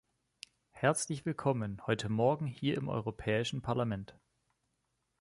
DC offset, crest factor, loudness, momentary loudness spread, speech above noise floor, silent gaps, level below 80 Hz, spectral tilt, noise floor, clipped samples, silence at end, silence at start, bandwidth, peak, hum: under 0.1%; 20 dB; -34 LUFS; 21 LU; 48 dB; none; -62 dBFS; -5.5 dB/octave; -81 dBFS; under 0.1%; 1.1 s; 0.75 s; 11.5 kHz; -16 dBFS; none